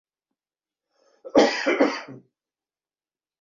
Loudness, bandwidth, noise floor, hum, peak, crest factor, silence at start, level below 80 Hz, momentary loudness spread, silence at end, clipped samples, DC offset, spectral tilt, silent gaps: -21 LUFS; 7.6 kHz; under -90 dBFS; none; -2 dBFS; 24 dB; 1.25 s; -66 dBFS; 15 LU; 1.25 s; under 0.1%; under 0.1%; -3.5 dB/octave; none